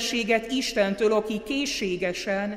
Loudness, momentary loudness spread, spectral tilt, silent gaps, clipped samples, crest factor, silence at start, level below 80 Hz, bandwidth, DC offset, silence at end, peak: -25 LUFS; 4 LU; -3.5 dB/octave; none; under 0.1%; 16 dB; 0 s; -54 dBFS; 16 kHz; under 0.1%; 0 s; -10 dBFS